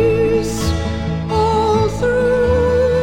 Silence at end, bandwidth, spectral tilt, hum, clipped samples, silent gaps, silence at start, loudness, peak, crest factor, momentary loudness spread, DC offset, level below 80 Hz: 0 s; 16.5 kHz; -6 dB/octave; none; under 0.1%; none; 0 s; -16 LUFS; -4 dBFS; 12 dB; 5 LU; under 0.1%; -28 dBFS